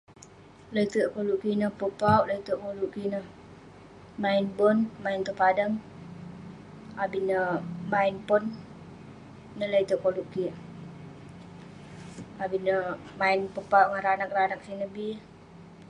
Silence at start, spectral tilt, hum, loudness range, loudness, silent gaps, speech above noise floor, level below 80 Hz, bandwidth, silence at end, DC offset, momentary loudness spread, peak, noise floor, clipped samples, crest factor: 0.1 s; -6.5 dB/octave; none; 5 LU; -28 LUFS; none; 24 dB; -62 dBFS; 11 kHz; 0.05 s; under 0.1%; 22 LU; -8 dBFS; -51 dBFS; under 0.1%; 22 dB